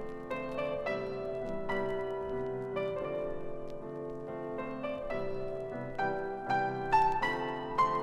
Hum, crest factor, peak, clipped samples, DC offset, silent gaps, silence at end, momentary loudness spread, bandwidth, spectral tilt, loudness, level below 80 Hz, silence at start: none; 20 dB; -16 dBFS; under 0.1%; under 0.1%; none; 0 s; 11 LU; 11.5 kHz; -6.5 dB/octave; -35 LUFS; -52 dBFS; 0 s